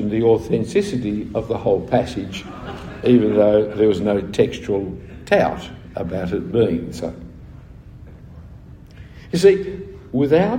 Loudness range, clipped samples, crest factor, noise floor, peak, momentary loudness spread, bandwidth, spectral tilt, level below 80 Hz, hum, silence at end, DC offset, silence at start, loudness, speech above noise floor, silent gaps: 7 LU; under 0.1%; 18 dB; -40 dBFS; -2 dBFS; 17 LU; 16 kHz; -7 dB/octave; -44 dBFS; none; 0 s; under 0.1%; 0 s; -19 LUFS; 22 dB; none